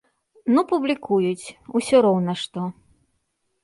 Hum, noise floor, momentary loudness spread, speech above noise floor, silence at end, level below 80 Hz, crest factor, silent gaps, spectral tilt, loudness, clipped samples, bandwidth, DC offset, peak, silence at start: none; -72 dBFS; 14 LU; 52 dB; 0.9 s; -64 dBFS; 18 dB; none; -6 dB/octave; -22 LUFS; under 0.1%; 11.5 kHz; under 0.1%; -4 dBFS; 0.45 s